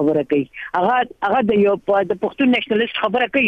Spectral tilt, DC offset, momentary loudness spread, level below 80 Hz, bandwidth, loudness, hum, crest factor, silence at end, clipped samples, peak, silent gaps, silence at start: -7.5 dB/octave; under 0.1%; 5 LU; -56 dBFS; 6 kHz; -18 LUFS; none; 12 dB; 0 s; under 0.1%; -6 dBFS; none; 0 s